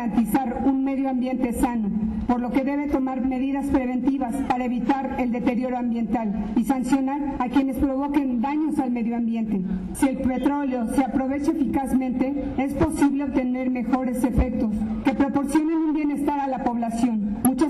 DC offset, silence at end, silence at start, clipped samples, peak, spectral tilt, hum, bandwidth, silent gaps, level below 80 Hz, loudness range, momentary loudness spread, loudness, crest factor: under 0.1%; 0 s; 0 s; under 0.1%; -14 dBFS; -6.5 dB/octave; none; 13 kHz; none; -40 dBFS; 1 LU; 3 LU; -24 LUFS; 10 dB